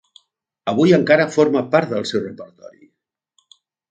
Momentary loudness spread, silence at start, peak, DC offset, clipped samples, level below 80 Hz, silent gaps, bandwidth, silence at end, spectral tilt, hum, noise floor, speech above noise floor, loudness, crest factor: 18 LU; 0.65 s; 0 dBFS; under 0.1%; under 0.1%; -64 dBFS; none; 9 kHz; 1.45 s; -6 dB/octave; none; -73 dBFS; 56 dB; -17 LUFS; 20 dB